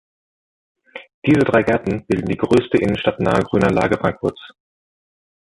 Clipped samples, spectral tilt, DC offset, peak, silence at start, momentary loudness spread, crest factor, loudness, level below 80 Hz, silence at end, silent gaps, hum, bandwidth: under 0.1%; -7 dB/octave; under 0.1%; -2 dBFS; 0.95 s; 10 LU; 16 dB; -18 LUFS; -44 dBFS; 1 s; 1.14-1.22 s; none; 11.5 kHz